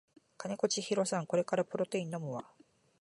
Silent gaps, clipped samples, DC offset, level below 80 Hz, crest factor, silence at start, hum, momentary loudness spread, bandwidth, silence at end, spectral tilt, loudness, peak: none; under 0.1%; under 0.1%; -82 dBFS; 20 dB; 0.4 s; none; 10 LU; 11.5 kHz; 0.6 s; -4.5 dB/octave; -35 LUFS; -16 dBFS